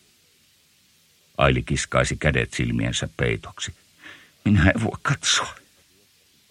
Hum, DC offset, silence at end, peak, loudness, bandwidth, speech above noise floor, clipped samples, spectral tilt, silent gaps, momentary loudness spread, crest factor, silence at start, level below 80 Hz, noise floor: none; under 0.1%; 0.95 s; -2 dBFS; -23 LUFS; 12.5 kHz; 38 dB; under 0.1%; -4.5 dB/octave; none; 15 LU; 22 dB; 1.4 s; -38 dBFS; -60 dBFS